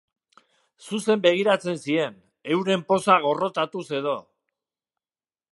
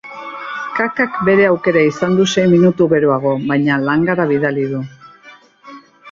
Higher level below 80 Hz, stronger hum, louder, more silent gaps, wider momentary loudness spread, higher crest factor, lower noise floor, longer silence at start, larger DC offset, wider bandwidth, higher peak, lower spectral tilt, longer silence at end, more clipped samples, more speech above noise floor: second, -74 dBFS vs -54 dBFS; neither; second, -23 LUFS vs -14 LUFS; neither; about the same, 11 LU vs 13 LU; first, 22 dB vs 14 dB; first, under -90 dBFS vs -43 dBFS; first, 0.8 s vs 0.05 s; neither; first, 11.5 kHz vs 7.6 kHz; about the same, -2 dBFS vs -2 dBFS; second, -5 dB/octave vs -6.5 dB/octave; first, 1.3 s vs 0 s; neither; first, over 67 dB vs 30 dB